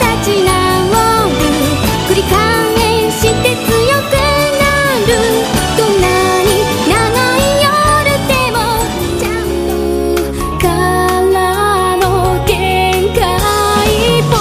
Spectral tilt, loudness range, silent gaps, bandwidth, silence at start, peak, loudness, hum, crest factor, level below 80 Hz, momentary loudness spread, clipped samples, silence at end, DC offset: -4.5 dB/octave; 2 LU; none; 15.5 kHz; 0 s; 0 dBFS; -11 LUFS; none; 12 dB; -24 dBFS; 4 LU; under 0.1%; 0 s; under 0.1%